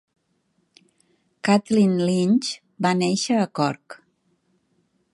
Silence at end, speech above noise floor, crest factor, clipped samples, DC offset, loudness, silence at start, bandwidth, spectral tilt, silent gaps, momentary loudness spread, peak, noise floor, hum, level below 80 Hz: 1.2 s; 49 dB; 20 dB; under 0.1%; under 0.1%; -21 LUFS; 1.45 s; 11.5 kHz; -5.5 dB/octave; none; 8 LU; -4 dBFS; -69 dBFS; none; -68 dBFS